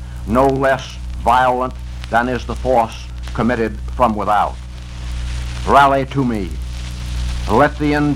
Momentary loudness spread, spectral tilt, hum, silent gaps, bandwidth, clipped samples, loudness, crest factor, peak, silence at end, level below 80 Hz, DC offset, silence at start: 14 LU; -6.5 dB/octave; 60 Hz at -30 dBFS; none; 14.5 kHz; under 0.1%; -17 LUFS; 16 dB; 0 dBFS; 0 s; -26 dBFS; under 0.1%; 0 s